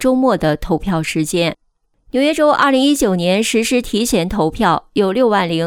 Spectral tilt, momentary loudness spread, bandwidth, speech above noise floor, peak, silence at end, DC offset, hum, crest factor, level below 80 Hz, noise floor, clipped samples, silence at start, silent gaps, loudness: -4.5 dB/octave; 6 LU; 17.5 kHz; 39 dB; -2 dBFS; 0 s; under 0.1%; none; 12 dB; -36 dBFS; -54 dBFS; under 0.1%; 0 s; none; -15 LUFS